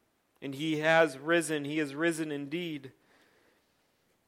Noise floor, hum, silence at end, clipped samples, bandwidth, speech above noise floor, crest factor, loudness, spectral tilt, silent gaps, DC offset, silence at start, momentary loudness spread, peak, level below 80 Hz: -72 dBFS; none; 1.35 s; under 0.1%; 16 kHz; 42 dB; 22 dB; -30 LUFS; -4.5 dB/octave; none; under 0.1%; 0.4 s; 15 LU; -10 dBFS; -82 dBFS